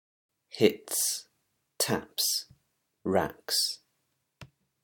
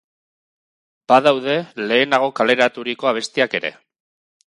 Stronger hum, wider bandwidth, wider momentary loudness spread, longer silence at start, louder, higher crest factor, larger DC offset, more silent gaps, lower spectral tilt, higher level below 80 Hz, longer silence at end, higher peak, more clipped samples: neither; first, 19 kHz vs 11.5 kHz; about the same, 10 LU vs 8 LU; second, 0.55 s vs 1.1 s; second, -29 LUFS vs -18 LUFS; first, 26 dB vs 20 dB; neither; neither; second, -2.5 dB/octave vs -4 dB/octave; about the same, -68 dBFS vs -70 dBFS; second, 0.4 s vs 0.85 s; second, -8 dBFS vs 0 dBFS; neither